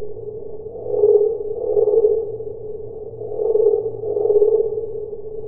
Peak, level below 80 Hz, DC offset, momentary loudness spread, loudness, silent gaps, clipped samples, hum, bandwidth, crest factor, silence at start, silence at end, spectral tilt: -4 dBFS; -50 dBFS; under 0.1%; 16 LU; -19 LUFS; none; under 0.1%; none; 1.3 kHz; 16 dB; 0 s; 0 s; -16.5 dB/octave